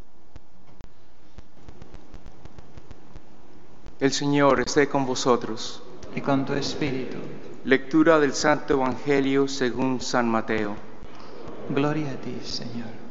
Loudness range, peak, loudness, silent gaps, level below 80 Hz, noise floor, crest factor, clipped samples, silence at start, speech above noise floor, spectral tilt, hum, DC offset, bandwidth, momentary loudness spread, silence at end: 5 LU; -2 dBFS; -24 LUFS; none; -50 dBFS; -56 dBFS; 24 dB; under 0.1%; 0.8 s; 32 dB; -4 dB/octave; none; 3%; 8 kHz; 17 LU; 0 s